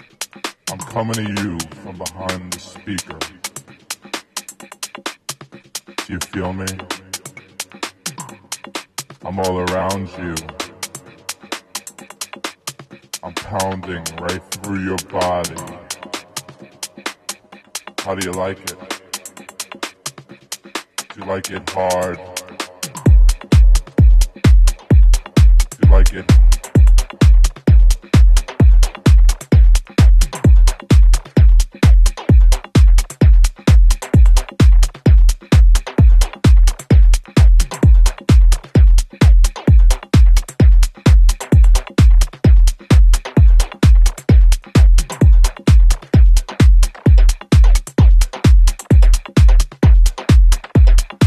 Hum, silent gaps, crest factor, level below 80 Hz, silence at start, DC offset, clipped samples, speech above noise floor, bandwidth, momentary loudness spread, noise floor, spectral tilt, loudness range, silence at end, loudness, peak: none; none; 12 dB; -12 dBFS; 0.2 s; under 0.1%; under 0.1%; 12 dB; 13 kHz; 16 LU; -35 dBFS; -6 dB/octave; 14 LU; 0 s; -14 LUFS; 0 dBFS